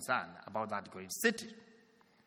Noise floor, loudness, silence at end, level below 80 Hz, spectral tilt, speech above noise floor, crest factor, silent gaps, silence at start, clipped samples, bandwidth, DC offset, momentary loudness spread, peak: -67 dBFS; -37 LUFS; 0.55 s; -82 dBFS; -3 dB/octave; 29 dB; 22 dB; none; 0 s; under 0.1%; 19 kHz; under 0.1%; 15 LU; -16 dBFS